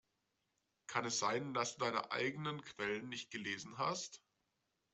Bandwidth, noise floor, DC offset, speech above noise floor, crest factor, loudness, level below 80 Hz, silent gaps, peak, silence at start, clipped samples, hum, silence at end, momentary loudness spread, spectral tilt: 8.2 kHz; -85 dBFS; under 0.1%; 44 dB; 22 dB; -40 LUFS; -82 dBFS; none; -20 dBFS; 0.9 s; under 0.1%; none; 0.75 s; 8 LU; -3 dB/octave